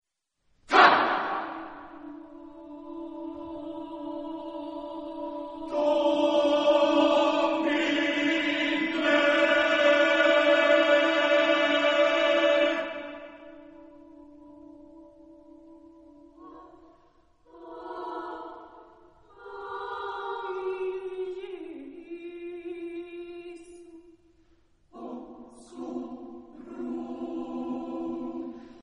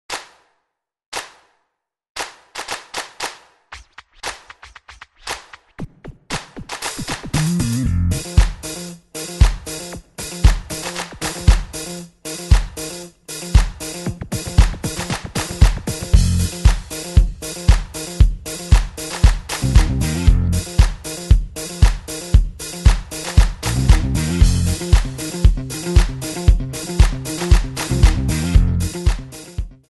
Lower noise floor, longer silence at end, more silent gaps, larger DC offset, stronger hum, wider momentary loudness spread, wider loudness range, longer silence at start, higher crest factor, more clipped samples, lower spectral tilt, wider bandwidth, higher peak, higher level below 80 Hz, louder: about the same, -74 dBFS vs -74 dBFS; second, 0 s vs 0.2 s; second, none vs 1.06-1.12 s, 2.10-2.15 s; neither; neither; first, 23 LU vs 14 LU; first, 21 LU vs 12 LU; first, 0.7 s vs 0.1 s; first, 24 dB vs 18 dB; neither; second, -3 dB/octave vs -5 dB/octave; second, 8.4 kHz vs 12 kHz; second, -4 dBFS vs 0 dBFS; second, -66 dBFS vs -20 dBFS; second, -25 LUFS vs -20 LUFS